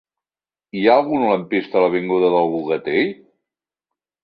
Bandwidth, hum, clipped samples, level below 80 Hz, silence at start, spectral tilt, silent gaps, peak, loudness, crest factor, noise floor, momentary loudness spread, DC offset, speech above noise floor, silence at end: 5.2 kHz; none; under 0.1%; -64 dBFS; 0.75 s; -9 dB/octave; none; -2 dBFS; -18 LUFS; 18 dB; under -90 dBFS; 6 LU; under 0.1%; over 73 dB; 1.1 s